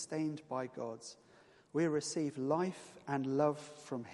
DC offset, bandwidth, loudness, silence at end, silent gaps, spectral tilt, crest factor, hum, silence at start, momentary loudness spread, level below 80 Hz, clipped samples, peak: under 0.1%; 11.5 kHz; -38 LUFS; 0 s; none; -5.5 dB/octave; 18 dB; none; 0 s; 12 LU; -80 dBFS; under 0.1%; -20 dBFS